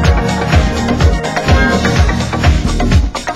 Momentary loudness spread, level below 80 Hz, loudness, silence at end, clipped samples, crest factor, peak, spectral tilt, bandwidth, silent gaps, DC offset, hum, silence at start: 3 LU; -14 dBFS; -13 LUFS; 0 s; under 0.1%; 12 dB; 0 dBFS; -5.5 dB/octave; 12.5 kHz; none; under 0.1%; none; 0 s